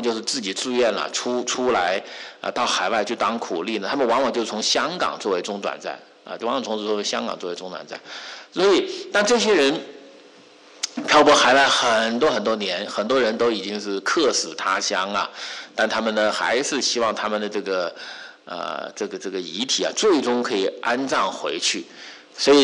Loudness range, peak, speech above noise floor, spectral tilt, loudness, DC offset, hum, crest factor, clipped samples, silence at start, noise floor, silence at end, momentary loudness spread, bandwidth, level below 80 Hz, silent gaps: 6 LU; -6 dBFS; 27 dB; -2 dB/octave; -21 LUFS; under 0.1%; none; 16 dB; under 0.1%; 0 s; -48 dBFS; 0 s; 14 LU; 11.5 kHz; -62 dBFS; none